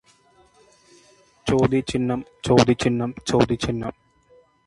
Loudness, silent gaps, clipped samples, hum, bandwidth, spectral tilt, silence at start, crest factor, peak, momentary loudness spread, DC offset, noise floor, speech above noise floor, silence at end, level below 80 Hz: -22 LUFS; none; under 0.1%; none; 11.5 kHz; -6 dB/octave; 1.45 s; 24 dB; 0 dBFS; 11 LU; under 0.1%; -57 dBFS; 36 dB; 0.75 s; -46 dBFS